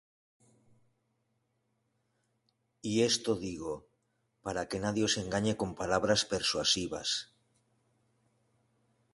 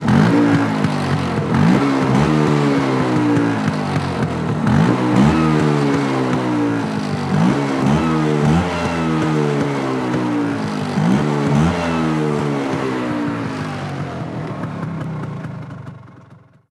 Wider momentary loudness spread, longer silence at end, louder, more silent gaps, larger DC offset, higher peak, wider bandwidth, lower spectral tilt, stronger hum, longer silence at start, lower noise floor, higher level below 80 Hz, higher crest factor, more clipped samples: about the same, 13 LU vs 11 LU; first, 1.9 s vs 0.5 s; second, -31 LUFS vs -18 LUFS; neither; neither; second, -14 dBFS vs 0 dBFS; about the same, 11.5 kHz vs 12 kHz; second, -3.5 dB/octave vs -7 dB/octave; neither; first, 2.85 s vs 0 s; first, -79 dBFS vs -45 dBFS; second, -60 dBFS vs -42 dBFS; first, 22 dB vs 16 dB; neither